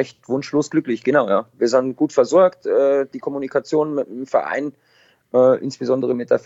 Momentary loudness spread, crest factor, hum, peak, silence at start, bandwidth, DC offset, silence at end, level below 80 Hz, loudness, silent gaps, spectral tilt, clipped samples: 9 LU; 16 dB; none; -2 dBFS; 0 s; 8 kHz; under 0.1%; 0.1 s; -68 dBFS; -19 LUFS; none; -6 dB/octave; under 0.1%